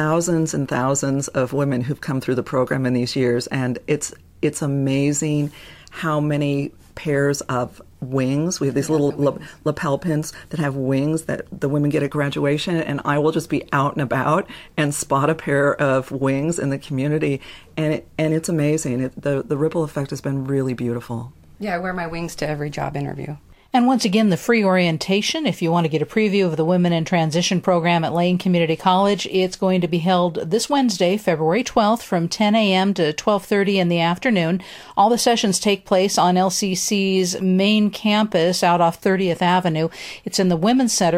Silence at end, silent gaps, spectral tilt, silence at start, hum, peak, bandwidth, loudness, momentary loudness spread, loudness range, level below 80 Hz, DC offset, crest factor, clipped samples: 0 s; none; -5 dB/octave; 0 s; none; -4 dBFS; 16 kHz; -20 LUFS; 8 LU; 5 LU; -52 dBFS; under 0.1%; 16 dB; under 0.1%